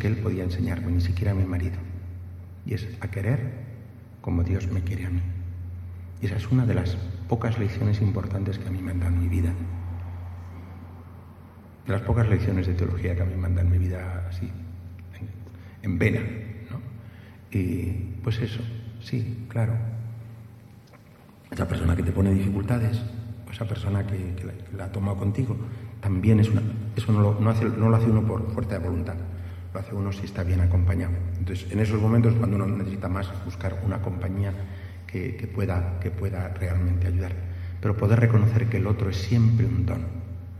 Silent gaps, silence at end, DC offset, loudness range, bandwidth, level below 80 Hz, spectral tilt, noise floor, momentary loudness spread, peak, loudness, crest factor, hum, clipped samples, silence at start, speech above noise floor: none; 0 s; under 0.1%; 7 LU; 13 kHz; -42 dBFS; -8.5 dB/octave; -50 dBFS; 17 LU; -6 dBFS; -26 LUFS; 20 dB; none; under 0.1%; 0 s; 26 dB